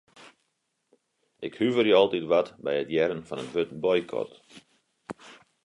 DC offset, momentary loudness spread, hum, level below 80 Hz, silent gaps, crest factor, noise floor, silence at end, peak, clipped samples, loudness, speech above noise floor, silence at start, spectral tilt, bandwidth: under 0.1%; 20 LU; none; -68 dBFS; none; 20 dB; -77 dBFS; 0.3 s; -8 dBFS; under 0.1%; -26 LUFS; 51 dB; 0.2 s; -6 dB/octave; 11 kHz